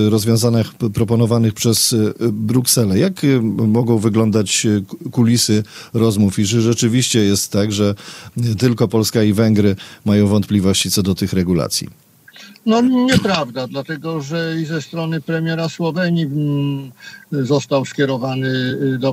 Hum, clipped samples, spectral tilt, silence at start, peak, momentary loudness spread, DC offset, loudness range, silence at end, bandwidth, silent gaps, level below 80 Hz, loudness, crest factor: none; under 0.1%; -5 dB/octave; 0 s; -2 dBFS; 9 LU; under 0.1%; 5 LU; 0 s; 16 kHz; none; -54 dBFS; -16 LUFS; 14 dB